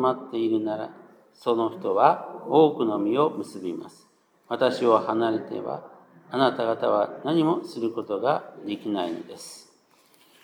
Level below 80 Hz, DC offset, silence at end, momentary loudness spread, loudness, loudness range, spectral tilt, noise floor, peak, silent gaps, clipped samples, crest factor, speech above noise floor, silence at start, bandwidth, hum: -86 dBFS; under 0.1%; 0.85 s; 14 LU; -25 LUFS; 3 LU; -6.5 dB/octave; -60 dBFS; -4 dBFS; none; under 0.1%; 22 dB; 36 dB; 0 s; 13 kHz; none